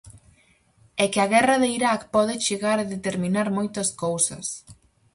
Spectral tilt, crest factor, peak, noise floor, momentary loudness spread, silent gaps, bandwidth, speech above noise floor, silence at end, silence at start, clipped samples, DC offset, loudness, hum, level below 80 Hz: -3.5 dB/octave; 18 dB; -6 dBFS; -60 dBFS; 9 LU; none; 11.5 kHz; 37 dB; 0.4 s; 0.05 s; under 0.1%; under 0.1%; -23 LUFS; none; -60 dBFS